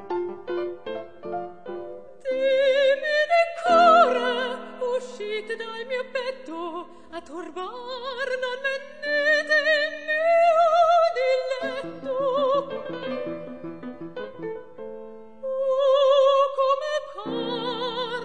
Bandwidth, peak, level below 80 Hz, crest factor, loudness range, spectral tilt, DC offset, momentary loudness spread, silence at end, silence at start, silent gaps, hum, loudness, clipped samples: 9.6 kHz; -6 dBFS; -68 dBFS; 18 dB; 11 LU; -3.5 dB/octave; 0.4%; 18 LU; 0 s; 0 s; none; none; -23 LUFS; under 0.1%